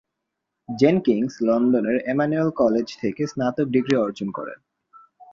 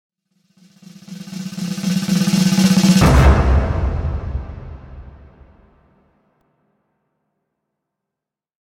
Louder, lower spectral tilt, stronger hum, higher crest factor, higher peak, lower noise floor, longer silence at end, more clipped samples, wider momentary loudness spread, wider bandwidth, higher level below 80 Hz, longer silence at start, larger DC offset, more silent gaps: second, -22 LUFS vs -16 LUFS; first, -7 dB/octave vs -5.5 dB/octave; neither; about the same, 20 dB vs 18 dB; about the same, -4 dBFS vs -2 dBFS; second, -81 dBFS vs -85 dBFS; second, 0.1 s vs 3.55 s; neither; second, 11 LU vs 24 LU; second, 7.4 kHz vs 16.5 kHz; second, -62 dBFS vs -24 dBFS; second, 0.7 s vs 1.1 s; neither; neither